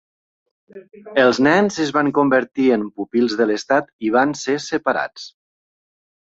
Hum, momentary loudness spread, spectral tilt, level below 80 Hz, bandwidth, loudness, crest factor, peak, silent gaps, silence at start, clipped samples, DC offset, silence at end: none; 8 LU; -5 dB/octave; -62 dBFS; 8 kHz; -18 LUFS; 16 dB; -2 dBFS; 3.93-3.99 s; 0.75 s; under 0.1%; under 0.1%; 1.05 s